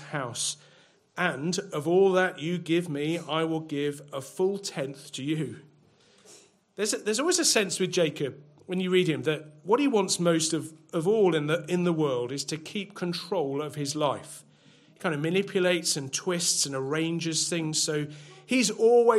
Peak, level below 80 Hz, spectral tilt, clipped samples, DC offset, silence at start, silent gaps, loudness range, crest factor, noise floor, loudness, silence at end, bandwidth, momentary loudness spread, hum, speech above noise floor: -8 dBFS; -76 dBFS; -4 dB/octave; under 0.1%; under 0.1%; 0 s; none; 6 LU; 20 dB; -60 dBFS; -27 LUFS; 0 s; 15.5 kHz; 11 LU; none; 33 dB